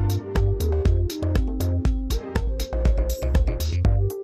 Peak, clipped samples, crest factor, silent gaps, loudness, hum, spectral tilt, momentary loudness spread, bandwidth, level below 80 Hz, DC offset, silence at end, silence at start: -8 dBFS; under 0.1%; 14 dB; none; -24 LUFS; none; -7 dB/octave; 5 LU; 15.5 kHz; -24 dBFS; under 0.1%; 0 s; 0 s